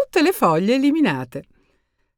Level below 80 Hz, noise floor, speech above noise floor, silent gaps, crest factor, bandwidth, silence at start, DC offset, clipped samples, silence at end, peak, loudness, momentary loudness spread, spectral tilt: -60 dBFS; -66 dBFS; 48 dB; none; 16 dB; 19 kHz; 0 s; under 0.1%; under 0.1%; 0.75 s; -4 dBFS; -18 LUFS; 15 LU; -5.5 dB/octave